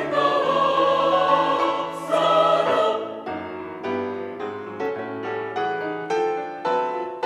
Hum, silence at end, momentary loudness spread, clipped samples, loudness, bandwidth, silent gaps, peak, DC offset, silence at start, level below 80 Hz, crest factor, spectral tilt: none; 0 s; 13 LU; under 0.1%; -23 LUFS; 13 kHz; none; -6 dBFS; under 0.1%; 0 s; -70 dBFS; 18 dB; -5 dB/octave